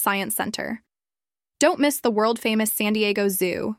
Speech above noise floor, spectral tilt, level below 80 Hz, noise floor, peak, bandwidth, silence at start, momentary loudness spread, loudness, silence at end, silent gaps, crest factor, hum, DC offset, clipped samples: over 68 dB; -3.5 dB/octave; -64 dBFS; under -90 dBFS; -6 dBFS; 16.5 kHz; 0 s; 8 LU; -22 LUFS; 0.05 s; none; 18 dB; none; under 0.1%; under 0.1%